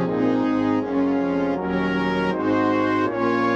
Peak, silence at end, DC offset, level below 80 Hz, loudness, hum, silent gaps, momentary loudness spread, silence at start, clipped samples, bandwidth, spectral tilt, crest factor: -8 dBFS; 0 s; under 0.1%; -50 dBFS; -22 LUFS; none; none; 3 LU; 0 s; under 0.1%; 7.4 kHz; -7.5 dB/octave; 12 dB